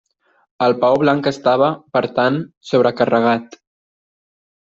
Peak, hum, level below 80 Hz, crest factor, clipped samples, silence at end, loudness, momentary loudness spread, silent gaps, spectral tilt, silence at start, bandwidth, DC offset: -2 dBFS; none; -60 dBFS; 16 dB; under 0.1%; 1.25 s; -17 LUFS; 5 LU; 2.57-2.61 s; -6.5 dB/octave; 0.6 s; 7.6 kHz; under 0.1%